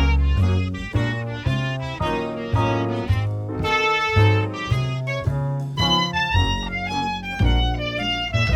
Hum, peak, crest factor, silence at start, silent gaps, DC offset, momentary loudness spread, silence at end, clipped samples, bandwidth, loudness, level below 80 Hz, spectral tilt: none; -6 dBFS; 16 dB; 0 s; none; under 0.1%; 7 LU; 0 s; under 0.1%; 13.5 kHz; -22 LUFS; -28 dBFS; -6 dB/octave